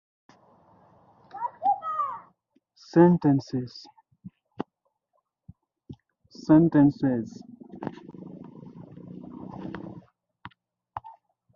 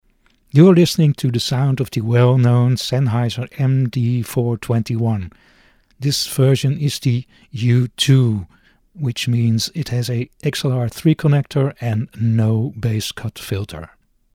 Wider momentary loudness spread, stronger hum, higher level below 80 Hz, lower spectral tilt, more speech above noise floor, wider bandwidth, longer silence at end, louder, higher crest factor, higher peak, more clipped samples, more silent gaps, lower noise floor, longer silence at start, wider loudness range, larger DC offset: first, 26 LU vs 11 LU; neither; second, -62 dBFS vs -50 dBFS; first, -9 dB/octave vs -6.5 dB/octave; first, 56 dB vs 41 dB; second, 7 kHz vs 16 kHz; about the same, 0.45 s vs 0.5 s; second, -23 LUFS vs -18 LUFS; first, 24 dB vs 18 dB; second, -4 dBFS vs 0 dBFS; neither; neither; first, -77 dBFS vs -57 dBFS; first, 1.35 s vs 0.55 s; first, 16 LU vs 5 LU; neither